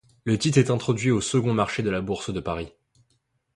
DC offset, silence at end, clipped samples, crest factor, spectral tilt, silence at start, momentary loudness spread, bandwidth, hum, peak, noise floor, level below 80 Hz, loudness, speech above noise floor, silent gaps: under 0.1%; 0.9 s; under 0.1%; 18 dB; -5.5 dB/octave; 0.25 s; 10 LU; 11.5 kHz; none; -6 dBFS; -71 dBFS; -50 dBFS; -24 LUFS; 47 dB; none